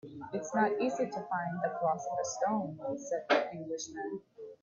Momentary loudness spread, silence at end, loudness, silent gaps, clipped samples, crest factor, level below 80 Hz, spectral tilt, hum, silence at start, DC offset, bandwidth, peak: 10 LU; 0.1 s; -34 LUFS; none; under 0.1%; 20 dB; -78 dBFS; -4.5 dB/octave; none; 0.05 s; under 0.1%; 7.6 kHz; -14 dBFS